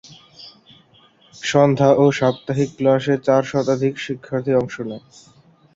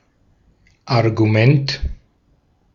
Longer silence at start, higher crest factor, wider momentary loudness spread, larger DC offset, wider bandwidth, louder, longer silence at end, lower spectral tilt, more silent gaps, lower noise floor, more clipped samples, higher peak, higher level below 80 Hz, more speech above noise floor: second, 0.05 s vs 0.85 s; about the same, 18 dB vs 18 dB; about the same, 14 LU vs 12 LU; neither; first, 7.8 kHz vs 7 kHz; about the same, -18 LUFS vs -17 LUFS; about the same, 0.75 s vs 0.8 s; about the same, -6.5 dB/octave vs -7.5 dB/octave; neither; second, -53 dBFS vs -59 dBFS; neither; about the same, -2 dBFS vs -2 dBFS; second, -58 dBFS vs -36 dBFS; second, 35 dB vs 44 dB